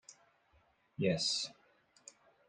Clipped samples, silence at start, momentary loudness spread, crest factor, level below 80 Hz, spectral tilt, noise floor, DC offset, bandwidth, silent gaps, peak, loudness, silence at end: under 0.1%; 0.1 s; 25 LU; 22 dB; -76 dBFS; -3.5 dB/octave; -72 dBFS; under 0.1%; 10.5 kHz; none; -20 dBFS; -35 LUFS; 0.95 s